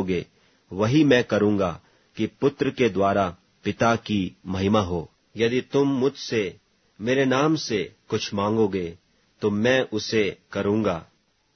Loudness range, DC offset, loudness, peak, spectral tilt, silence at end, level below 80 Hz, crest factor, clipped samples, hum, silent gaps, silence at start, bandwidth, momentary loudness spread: 2 LU; under 0.1%; -24 LUFS; -4 dBFS; -6 dB/octave; 0.5 s; -56 dBFS; 20 dB; under 0.1%; none; none; 0 s; 6.6 kHz; 11 LU